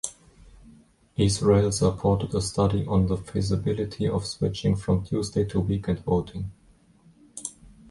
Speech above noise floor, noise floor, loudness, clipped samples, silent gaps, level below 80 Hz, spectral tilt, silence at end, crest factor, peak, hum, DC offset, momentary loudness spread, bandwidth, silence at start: 34 dB; -58 dBFS; -25 LUFS; under 0.1%; none; -42 dBFS; -6.5 dB/octave; 0.4 s; 18 dB; -8 dBFS; none; under 0.1%; 16 LU; 11.5 kHz; 0.05 s